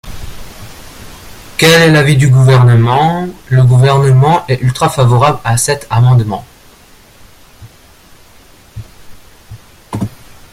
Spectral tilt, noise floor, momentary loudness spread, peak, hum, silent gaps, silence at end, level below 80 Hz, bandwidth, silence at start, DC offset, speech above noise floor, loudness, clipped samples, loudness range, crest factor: -5.5 dB/octave; -41 dBFS; 22 LU; 0 dBFS; none; none; 0.45 s; -36 dBFS; 15.5 kHz; 0.05 s; under 0.1%; 33 dB; -9 LUFS; under 0.1%; 11 LU; 12 dB